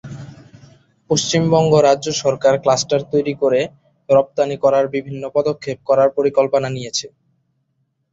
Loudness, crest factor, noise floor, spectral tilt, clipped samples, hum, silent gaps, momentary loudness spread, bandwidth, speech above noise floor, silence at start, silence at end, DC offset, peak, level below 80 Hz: -17 LUFS; 16 dB; -68 dBFS; -4.5 dB/octave; under 0.1%; none; none; 11 LU; 8 kHz; 52 dB; 0.05 s; 1.05 s; under 0.1%; -2 dBFS; -56 dBFS